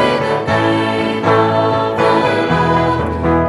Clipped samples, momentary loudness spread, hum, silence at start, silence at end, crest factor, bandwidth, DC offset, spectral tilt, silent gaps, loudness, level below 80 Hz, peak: under 0.1%; 4 LU; none; 0 s; 0 s; 14 dB; 12 kHz; under 0.1%; -6.5 dB/octave; none; -14 LUFS; -36 dBFS; 0 dBFS